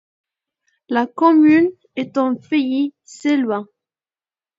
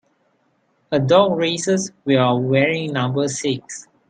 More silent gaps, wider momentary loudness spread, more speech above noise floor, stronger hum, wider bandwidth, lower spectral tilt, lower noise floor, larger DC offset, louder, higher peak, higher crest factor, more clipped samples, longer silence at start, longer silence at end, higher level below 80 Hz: neither; first, 13 LU vs 9 LU; first, over 73 dB vs 46 dB; neither; second, 7.8 kHz vs 9.6 kHz; about the same, -5.5 dB/octave vs -5 dB/octave; first, under -90 dBFS vs -64 dBFS; neither; about the same, -18 LUFS vs -19 LUFS; about the same, -2 dBFS vs -2 dBFS; about the same, 18 dB vs 18 dB; neither; about the same, 0.9 s vs 0.9 s; first, 0.95 s vs 0.3 s; second, -68 dBFS vs -62 dBFS